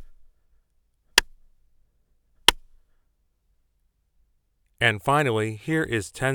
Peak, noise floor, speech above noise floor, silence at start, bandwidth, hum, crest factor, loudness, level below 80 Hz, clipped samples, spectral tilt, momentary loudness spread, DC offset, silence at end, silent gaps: 0 dBFS; -69 dBFS; 45 dB; 0 s; over 20 kHz; none; 28 dB; -23 LUFS; -50 dBFS; under 0.1%; -3 dB/octave; 6 LU; under 0.1%; 0 s; none